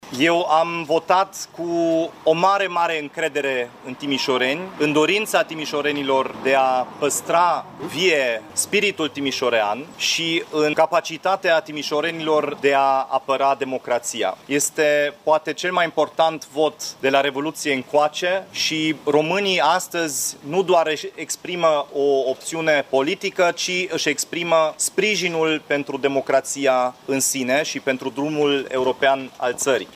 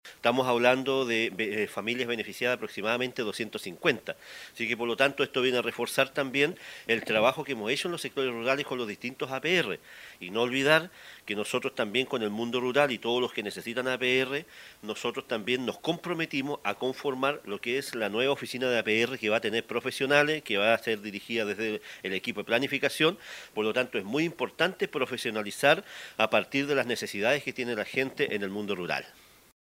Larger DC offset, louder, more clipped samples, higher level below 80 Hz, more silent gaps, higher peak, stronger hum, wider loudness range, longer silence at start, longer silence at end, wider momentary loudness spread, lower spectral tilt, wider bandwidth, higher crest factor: neither; first, -20 LUFS vs -29 LUFS; neither; about the same, -68 dBFS vs -72 dBFS; neither; about the same, -4 dBFS vs -6 dBFS; neither; about the same, 1 LU vs 3 LU; about the same, 0.05 s vs 0.05 s; second, 0.1 s vs 0.55 s; second, 6 LU vs 9 LU; second, -2.5 dB/octave vs -4 dB/octave; about the same, 16 kHz vs 16 kHz; second, 18 dB vs 24 dB